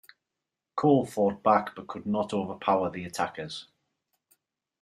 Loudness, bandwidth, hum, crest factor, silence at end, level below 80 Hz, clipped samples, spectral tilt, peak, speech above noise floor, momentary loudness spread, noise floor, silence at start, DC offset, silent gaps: -28 LUFS; 14.5 kHz; none; 20 dB; 1.2 s; -70 dBFS; under 0.1%; -6.5 dB/octave; -8 dBFS; 60 dB; 14 LU; -87 dBFS; 0.75 s; under 0.1%; none